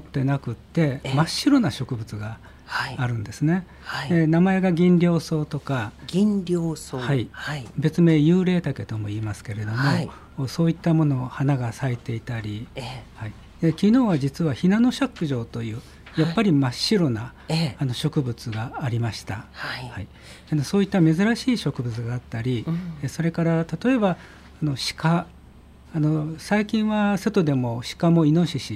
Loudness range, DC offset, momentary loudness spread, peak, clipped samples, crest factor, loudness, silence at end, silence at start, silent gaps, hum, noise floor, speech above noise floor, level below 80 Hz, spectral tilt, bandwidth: 4 LU; under 0.1%; 13 LU; -8 dBFS; under 0.1%; 16 dB; -23 LUFS; 0 s; 0 s; none; none; -47 dBFS; 25 dB; -50 dBFS; -6.5 dB/octave; 14 kHz